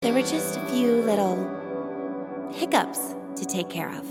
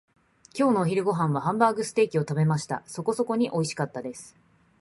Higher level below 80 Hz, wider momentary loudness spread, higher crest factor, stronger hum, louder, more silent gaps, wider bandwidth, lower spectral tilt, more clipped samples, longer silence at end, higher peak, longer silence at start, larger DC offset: about the same, -70 dBFS vs -66 dBFS; about the same, 11 LU vs 10 LU; about the same, 20 dB vs 20 dB; neither; about the same, -26 LUFS vs -26 LUFS; neither; first, 17 kHz vs 11.5 kHz; second, -4.5 dB/octave vs -6.5 dB/octave; neither; second, 0 s vs 0.5 s; about the same, -6 dBFS vs -6 dBFS; second, 0 s vs 0.55 s; neither